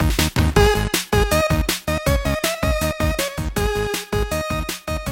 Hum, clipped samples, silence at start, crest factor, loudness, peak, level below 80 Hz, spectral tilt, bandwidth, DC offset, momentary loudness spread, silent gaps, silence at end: none; under 0.1%; 0 s; 18 dB; -20 LUFS; -2 dBFS; -26 dBFS; -4.5 dB/octave; 17 kHz; under 0.1%; 7 LU; none; 0 s